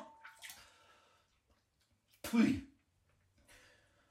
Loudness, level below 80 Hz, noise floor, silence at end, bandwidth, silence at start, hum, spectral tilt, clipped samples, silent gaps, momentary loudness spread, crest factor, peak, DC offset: -35 LUFS; -70 dBFS; -78 dBFS; 1.45 s; 16 kHz; 0 s; none; -5.5 dB/octave; under 0.1%; none; 23 LU; 22 dB; -20 dBFS; under 0.1%